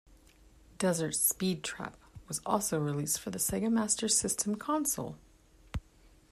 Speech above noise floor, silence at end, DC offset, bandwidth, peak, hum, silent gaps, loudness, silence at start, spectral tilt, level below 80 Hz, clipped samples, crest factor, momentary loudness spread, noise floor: 29 dB; 0.5 s; under 0.1%; 15 kHz; -14 dBFS; none; none; -31 LUFS; 0.8 s; -3.5 dB/octave; -56 dBFS; under 0.1%; 20 dB; 16 LU; -61 dBFS